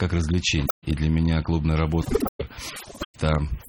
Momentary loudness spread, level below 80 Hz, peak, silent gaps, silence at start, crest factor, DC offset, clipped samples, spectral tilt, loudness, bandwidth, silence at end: 12 LU; -32 dBFS; -4 dBFS; 0.71-0.82 s, 2.29-2.39 s, 3.05-3.14 s; 0 s; 20 dB; under 0.1%; under 0.1%; -6 dB/octave; -24 LUFS; 17 kHz; 0 s